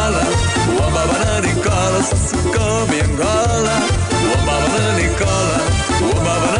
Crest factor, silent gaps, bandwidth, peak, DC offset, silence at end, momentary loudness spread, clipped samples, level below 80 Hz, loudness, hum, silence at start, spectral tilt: 10 dB; none; 10.5 kHz; -6 dBFS; under 0.1%; 0 s; 1 LU; under 0.1%; -26 dBFS; -16 LUFS; none; 0 s; -4.5 dB/octave